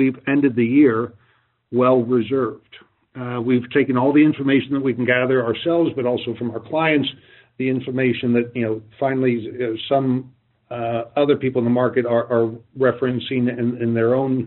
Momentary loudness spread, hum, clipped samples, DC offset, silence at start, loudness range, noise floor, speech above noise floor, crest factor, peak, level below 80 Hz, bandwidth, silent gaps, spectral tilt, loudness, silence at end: 9 LU; none; under 0.1%; under 0.1%; 0 s; 3 LU; -60 dBFS; 41 dB; 16 dB; -4 dBFS; -64 dBFS; 4.2 kHz; none; -5.5 dB/octave; -20 LUFS; 0 s